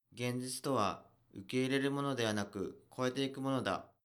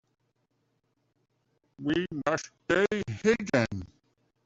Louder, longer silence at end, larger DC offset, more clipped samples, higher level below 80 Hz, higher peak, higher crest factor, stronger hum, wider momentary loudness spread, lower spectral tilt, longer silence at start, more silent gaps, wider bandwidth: second, -37 LUFS vs -29 LUFS; second, 0.2 s vs 0.6 s; neither; neither; second, -76 dBFS vs -62 dBFS; second, -20 dBFS vs -12 dBFS; about the same, 18 dB vs 20 dB; neither; first, 10 LU vs 7 LU; about the same, -5 dB/octave vs -5.5 dB/octave; second, 0.15 s vs 1.8 s; neither; first, 19.5 kHz vs 8 kHz